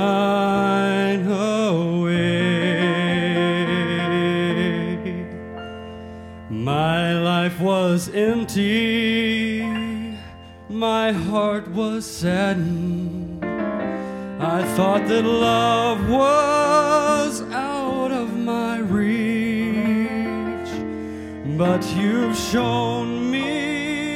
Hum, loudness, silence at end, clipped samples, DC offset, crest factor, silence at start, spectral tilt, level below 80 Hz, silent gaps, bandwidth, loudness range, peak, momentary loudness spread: none; -21 LUFS; 0 s; under 0.1%; under 0.1%; 16 dB; 0 s; -5.5 dB/octave; -48 dBFS; none; 15.5 kHz; 5 LU; -4 dBFS; 11 LU